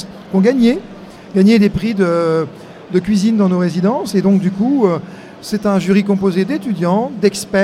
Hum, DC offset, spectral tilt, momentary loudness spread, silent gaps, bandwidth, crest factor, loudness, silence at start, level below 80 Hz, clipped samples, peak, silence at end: none; under 0.1%; -7 dB/octave; 11 LU; none; 14 kHz; 14 dB; -15 LUFS; 0 s; -46 dBFS; under 0.1%; 0 dBFS; 0 s